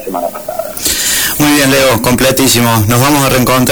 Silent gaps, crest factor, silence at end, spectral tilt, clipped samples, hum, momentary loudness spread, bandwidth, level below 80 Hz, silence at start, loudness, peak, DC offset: none; 10 dB; 0 s; -3.5 dB/octave; under 0.1%; none; 10 LU; over 20 kHz; -32 dBFS; 0 s; -9 LUFS; -2 dBFS; 0.8%